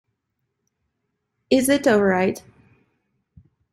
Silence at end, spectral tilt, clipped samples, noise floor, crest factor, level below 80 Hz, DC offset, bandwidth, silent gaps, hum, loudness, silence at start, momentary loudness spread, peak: 1.35 s; -4.5 dB/octave; under 0.1%; -77 dBFS; 20 dB; -58 dBFS; under 0.1%; 15.5 kHz; none; none; -19 LUFS; 1.5 s; 7 LU; -4 dBFS